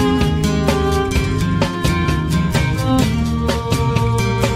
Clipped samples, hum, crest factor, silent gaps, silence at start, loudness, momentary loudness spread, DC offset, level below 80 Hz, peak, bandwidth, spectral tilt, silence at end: under 0.1%; none; 14 dB; none; 0 s; -17 LUFS; 2 LU; under 0.1%; -26 dBFS; -2 dBFS; 16 kHz; -6 dB/octave; 0 s